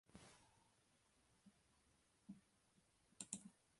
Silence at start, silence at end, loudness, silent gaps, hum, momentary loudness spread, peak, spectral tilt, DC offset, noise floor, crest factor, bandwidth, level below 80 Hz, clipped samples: 0.05 s; 0 s; -57 LUFS; none; none; 13 LU; -30 dBFS; -2.5 dB/octave; under 0.1%; -79 dBFS; 34 dB; 11.5 kHz; -86 dBFS; under 0.1%